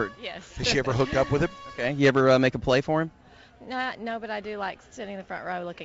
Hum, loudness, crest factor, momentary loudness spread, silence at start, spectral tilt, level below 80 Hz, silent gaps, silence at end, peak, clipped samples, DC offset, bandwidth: none; -26 LUFS; 16 dB; 15 LU; 0 s; -5.5 dB/octave; -48 dBFS; none; 0 s; -10 dBFS; under 0.1%; under 0.1%; 8 kHz